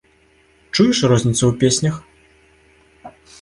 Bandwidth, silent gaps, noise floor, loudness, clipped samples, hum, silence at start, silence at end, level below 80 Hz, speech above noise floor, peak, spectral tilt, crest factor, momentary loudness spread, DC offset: 11.5 kHz; none; -55 dBFS; -16 LUFS; under 0.1%; none; 0.75 s; 0.3 s; -48 dBFS; 40 dB; -2 dBFS; -5 dB/octave; 18 dB; 9 LU; under 0.1%